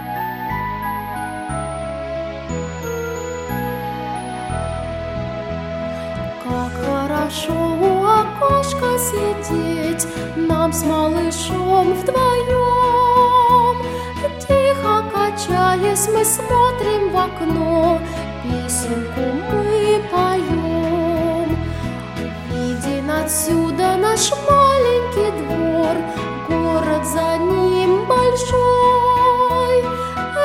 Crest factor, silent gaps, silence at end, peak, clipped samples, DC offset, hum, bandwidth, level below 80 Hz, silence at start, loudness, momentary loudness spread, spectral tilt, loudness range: 16 dB; none; 0 s; -2 dBFS; under 0.1%; under 0.1%; none; 16.5 kHz; -36 dBFS; 0 s; -18 LUFS; 12 LU; -4.5 dB/octave; 9 LU